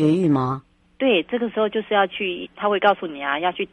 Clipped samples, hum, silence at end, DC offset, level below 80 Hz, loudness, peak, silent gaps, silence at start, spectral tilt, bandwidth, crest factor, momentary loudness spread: under 0.1%; none; 0.05 s; under 0.1%; -60 dBFS; -21 LUFS; -4 dBFS; none; 0 s; -7.5 dB/octave; 9.8 kHz; 18 dB; 7 LU